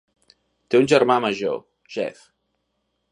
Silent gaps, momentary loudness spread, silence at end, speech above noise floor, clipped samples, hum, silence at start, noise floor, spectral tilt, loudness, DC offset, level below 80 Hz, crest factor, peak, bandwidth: none; 15 LU; 1 s; 54 dB; under 0.1%; none; 0.7 s; -74 dBFS; -5 dB/octave; -21 LUFS; under 0.1%; -68 dBFS; 20 dB; -4 dBFS; 11 kHz